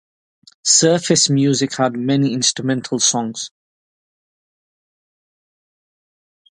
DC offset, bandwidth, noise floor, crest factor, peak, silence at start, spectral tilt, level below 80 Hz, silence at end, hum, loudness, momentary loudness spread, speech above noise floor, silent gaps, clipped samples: under 0.1%; 11.5 kHz; under -90 dBFS; 20 dB; 0 dBFS; 0.65 s; -3.5 dB/octave; -64 dBFS; 3.1 s; none; -16 LUFS; 11 LU; over 73 dB; none; under 0.1%